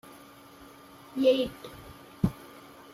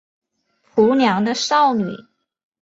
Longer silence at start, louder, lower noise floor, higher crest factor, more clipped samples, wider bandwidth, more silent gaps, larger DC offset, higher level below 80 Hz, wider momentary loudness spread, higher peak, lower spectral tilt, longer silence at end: second, 0.6 s vs 0.75 s; second, -29 LUFS vs -17 LUFS; second, -51 dBFS vs -64 dBFS; first, 22 dB vs 16 dB; neither; first, 15.5 kHz vs 8 kHz; neither; neither; first, -54 dBFS vs -62 dBFS; first, 26 LU vs 11 LU; second, -10 dBFS vs -2 dBFS; first, -6.5 dB/octave vs -4.5 dB/octave; second, 0.35 s vs 0.6 s